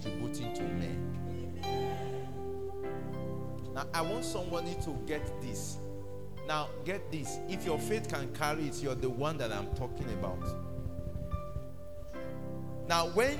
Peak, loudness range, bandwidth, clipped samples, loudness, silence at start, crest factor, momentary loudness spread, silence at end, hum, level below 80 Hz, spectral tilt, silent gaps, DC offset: -14 dBFS; 3 LU; 18 kHz; under 0.1%; -37 LUFS; 0 s; 22 dB; 8 LU; 0 s; none; -50 dBFS; -5 dB/octave; none; 0.8%